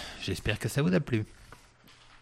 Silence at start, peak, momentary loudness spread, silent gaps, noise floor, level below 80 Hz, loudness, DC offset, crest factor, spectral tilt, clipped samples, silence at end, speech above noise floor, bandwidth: 0 s; -12 dBFS; 8 LU; none; -57 dBFS; -50 dBFS; -30 LUFS; under 0.1%; 20 dB; -5.5 dB/octave; under 0.1%; 0.05 s; 28 dB; 16 kHz